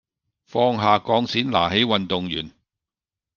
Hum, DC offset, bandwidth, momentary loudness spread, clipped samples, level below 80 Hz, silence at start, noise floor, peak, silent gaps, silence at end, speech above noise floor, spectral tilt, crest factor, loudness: none; under 0.1%; 7.2 kHz; 10 LU; under 0.1%; -58 dBFS; 0.55 s; -90 dBFS; -2 dBFS; none; 0.85 s; 69 dB; -6 dB/octave; 20 dB; -21 LUFS